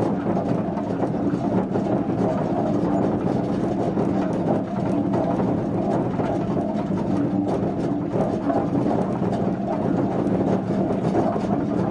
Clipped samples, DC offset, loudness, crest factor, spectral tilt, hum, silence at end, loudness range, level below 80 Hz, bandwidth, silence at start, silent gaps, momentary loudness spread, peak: under 0.1%; under 0.1%; -23 LUFS; 14 dB; -9 dB/octave; none; 0 s; 1 LU; -48 dBFS; 9.6 kHz; 0 s; none; 2 LU; -8 dBFS